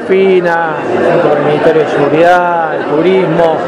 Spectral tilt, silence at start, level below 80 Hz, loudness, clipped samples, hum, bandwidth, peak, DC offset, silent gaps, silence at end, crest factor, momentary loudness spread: -7 dB/octave; 0 s; -50 dBFS; -10 LUFS; 1%; none; 10 kHz; 0 dBFS; under 0.1%; none; 0 s; 10 dB; 5 LU